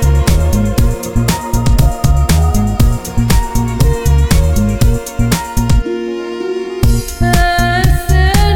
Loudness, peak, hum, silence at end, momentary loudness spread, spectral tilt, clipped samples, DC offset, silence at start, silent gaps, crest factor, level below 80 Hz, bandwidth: -13 LUFS; 0 dBFS; none; 0 s; 5 LU; -5.5 dB/octave; under 0.1%; 0.5%; 0 s; none; 10 dB; -14 dBFS; 19 kHz